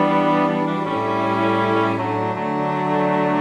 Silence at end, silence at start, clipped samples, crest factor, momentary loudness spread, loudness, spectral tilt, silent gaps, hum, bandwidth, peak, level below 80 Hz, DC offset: 0 s; 0 s; under 0.1%; 12 dB; 5 LU; -20 LUFS; -7.5 dB/octave; none; none; 10.5 kHz; -6 dBFS; -60 dBFS; under 0.1%